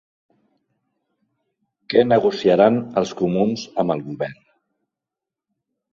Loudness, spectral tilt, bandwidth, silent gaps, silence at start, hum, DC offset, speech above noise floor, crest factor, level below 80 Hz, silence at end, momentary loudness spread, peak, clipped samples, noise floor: -19 LUFS; -6.5 dB/octave; 7.4 kHz; none; 1.9 s; none; under 0.1%; 68 dB; 20 dB; -60 dBFS; 1.6 s; 11 LU; -2 dBFS; under 0.1%; -87 dBFS